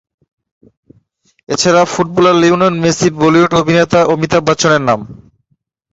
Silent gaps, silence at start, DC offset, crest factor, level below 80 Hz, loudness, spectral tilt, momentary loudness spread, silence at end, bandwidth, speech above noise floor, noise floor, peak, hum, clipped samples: none; 1.5 s; under 0.1%; 12 dB; -46 dBFS; -11 LUFS; -5 dB/octave; 5 LU; 0.8 s; 8 kHz; 52 dB; -63 dBFS; 0 dBFS; none; under 0.1%